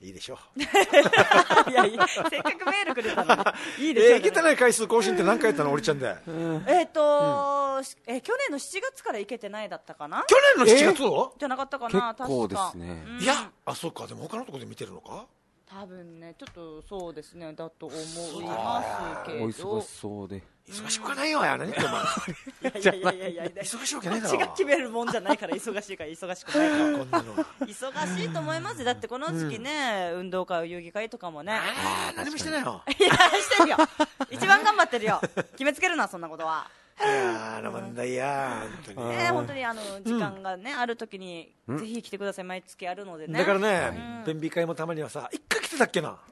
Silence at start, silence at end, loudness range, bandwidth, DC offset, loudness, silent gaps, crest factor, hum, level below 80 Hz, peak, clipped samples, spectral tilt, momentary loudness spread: 0 s; 0.15 s; 12 LU; 12.5 kHz; under 0.1%; -25 LUFS; none; 24 dB; none; -62 dBFS; -2 dBFS; under 0.1%; -3.5 dB/octave; 20 LU